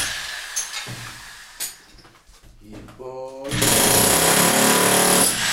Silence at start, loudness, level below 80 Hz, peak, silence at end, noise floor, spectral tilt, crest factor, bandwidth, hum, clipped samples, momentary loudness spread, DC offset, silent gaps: 0 s; -16 LUFS; -44 dBFS; -2 dBFS; 0 s; -49 dBFS; -2 dB/octave; 18 dB; 16 kHz; none; under 0.1%; 21 LU; under 0.1%; none